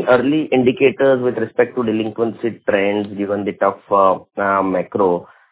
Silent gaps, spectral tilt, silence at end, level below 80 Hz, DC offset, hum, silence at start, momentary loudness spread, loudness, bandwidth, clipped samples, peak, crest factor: none; -10.5 dB/octave; 0.25 s; -56 dBFS; under 0.1%; none; 0 s; 7 LU; -17 LUFS; 4 kHz; under 0.1%; 0 dBFS; 16 dB